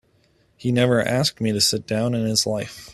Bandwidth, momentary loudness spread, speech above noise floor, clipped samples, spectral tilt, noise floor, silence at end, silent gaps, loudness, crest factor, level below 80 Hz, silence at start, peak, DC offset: 14 kHz; 6 LU; 40 dB; under 0.1%; -4 dB/octave; -61 dBFS; 0 s; none; -21 LUFS; 20 dB; -54 dBFS; 0.65 s; -4 dBFS; under 0.1%